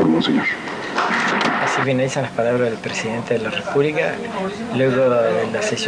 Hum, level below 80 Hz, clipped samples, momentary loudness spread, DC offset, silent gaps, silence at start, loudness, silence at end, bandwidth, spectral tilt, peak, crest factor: none; -58 dBFS; under 0.1%; 7 LU; under 0.1%; none; 0 s; -19 LUFS; 0 s; 10.5 kHz; -5 dB/octave; -4 dBFS; 14 dB